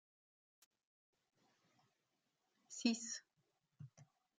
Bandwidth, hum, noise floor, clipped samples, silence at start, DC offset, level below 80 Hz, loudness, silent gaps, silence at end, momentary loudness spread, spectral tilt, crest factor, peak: 9.6 kHz; none; -87 dBFS; under 0.1%; 2.7 s; under 0.1%; under -90 dBFS; -43 LUFS; none; 0.35 s; 21 LU; -2.5 dB/octave; 26 dB; -24 dBFS